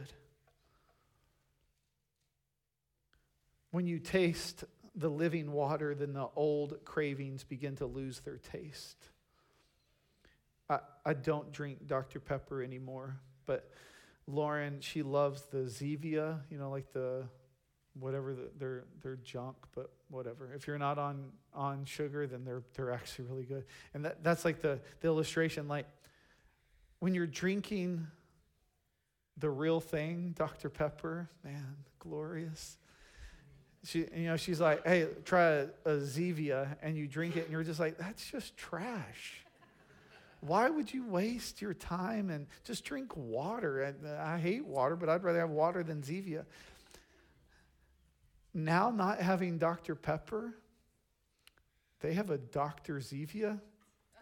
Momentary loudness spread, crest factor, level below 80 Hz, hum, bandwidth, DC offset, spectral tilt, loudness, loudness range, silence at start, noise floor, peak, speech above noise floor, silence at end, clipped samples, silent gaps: 15 LU; 22 dB; -66 dBFS; none; 17.5 kHz; under 0.1%; -6 dB/octave; -37 LUFS; 8 LU; 0 s; -86 dBFS; -16 dBFS; 49 dB; 0.55 s; under 0.1%; none